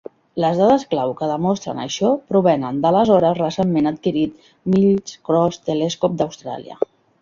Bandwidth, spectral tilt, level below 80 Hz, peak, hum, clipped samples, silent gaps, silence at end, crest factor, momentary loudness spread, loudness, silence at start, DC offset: 7.4 kHz; -6.5 dB/octave; -56 dBFS; -2 dBFS; none; under 0.1%; none; 0.35 s; 16 dB; 11 LU; -19 LUFS; 0.35 s; under 0.1%